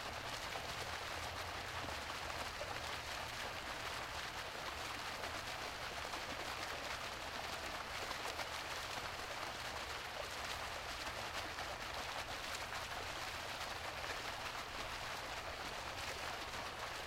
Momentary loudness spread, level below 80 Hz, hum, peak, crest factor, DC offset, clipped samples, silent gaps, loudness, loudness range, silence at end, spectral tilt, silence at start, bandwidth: 1 LU; -60 dBFS; none; -24 dBFS; 20 dB; under 0.1%; under 0.1%; none; -44 LUFS; 0 LU; 0 s; -2 dB/octave; 0 s; 16 kHz